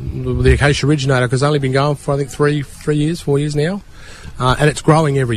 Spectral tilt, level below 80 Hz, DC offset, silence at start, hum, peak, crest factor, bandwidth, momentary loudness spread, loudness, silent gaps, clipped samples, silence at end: -6 dB/octave; -28 dBFS; under 0.1%; 0 s; none; 0 dBFS; 14 dB; 13 kHz; 8 LU; -16 LUFS; none; under 0.1%; 0 s